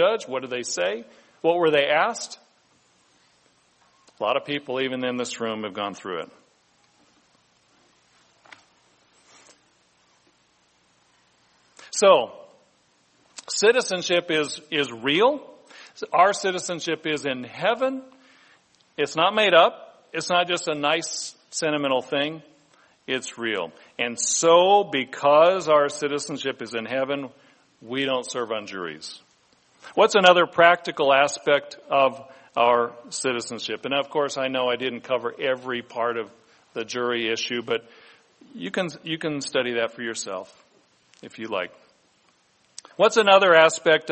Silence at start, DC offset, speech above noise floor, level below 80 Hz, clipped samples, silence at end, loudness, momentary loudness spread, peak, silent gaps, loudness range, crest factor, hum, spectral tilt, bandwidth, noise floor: 0 s; under 0.1%; 41 dB; -74 dBFS; under 0.1%; 0 s; -22 LUFS; 16 LU; 0 dBFS; none; 9 LU; 24 dB; none; -2.5 dB/octave; 8.8 kHz; -63 dBFS